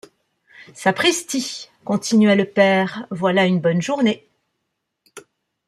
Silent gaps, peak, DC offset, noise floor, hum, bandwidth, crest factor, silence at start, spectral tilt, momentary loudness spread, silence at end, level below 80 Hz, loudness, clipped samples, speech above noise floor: none; -2 dBFS; under 0.1%; -76 dBFS; none; 14.5 kHz; 18 dB; 0.6 s; -4.5 dB/octave; 9 LU; 0.5 s; -66 dBFS; -18 LUFS; under 0.1%; 58 dB